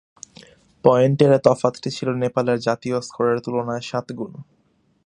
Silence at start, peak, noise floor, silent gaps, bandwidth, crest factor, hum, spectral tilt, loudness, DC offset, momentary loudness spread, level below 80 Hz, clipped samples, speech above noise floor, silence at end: 0.85 s; 0 dBFS; -49 dBFS; none; 10.5 kHz; 20 dB; none; -6.5 dB/octave; -20 LUFS; under 0.1%; 12 LU; -60 dBFS; under 0.1%; 29 dB; 0.65 s